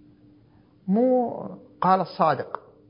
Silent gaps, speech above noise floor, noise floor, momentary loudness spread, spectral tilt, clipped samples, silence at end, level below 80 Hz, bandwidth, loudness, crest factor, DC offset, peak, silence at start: none; 34 dB; -56 dBFS; 16 LU; -11.5 dB/octave; under 0.1%; 0.3 s; -68 dBFS; 5.4 kHz; -23 LUFS; 20 dB; under 0.1%; -6 dBFS; 0.85 s